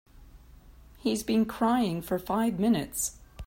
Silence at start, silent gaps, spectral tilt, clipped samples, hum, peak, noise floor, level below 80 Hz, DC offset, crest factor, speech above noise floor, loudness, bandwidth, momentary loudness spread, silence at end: 0.15 s; none; -5 dB/octave; under 0.1%; none; -14 dBFS; -52 dBFS; -52 dBFS; under 0.1%; 16 dB; 25 dB; -28 LUFS; 16.5 kHz; 6 LU; 0 s